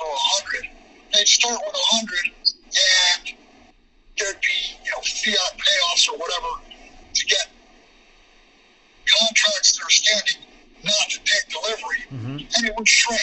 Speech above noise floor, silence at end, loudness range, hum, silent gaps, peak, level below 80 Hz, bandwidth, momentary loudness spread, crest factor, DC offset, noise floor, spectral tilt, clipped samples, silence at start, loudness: 33 dB; 0 s; 4 LU; none; none; 0 dBFS; -52 dBFS; 8.4 kHz; 14 LU; 22 dB; under 0.1%; -54 dBFS; 0.5 dB/octave; under 0.1%; 0 s; -18 LUFS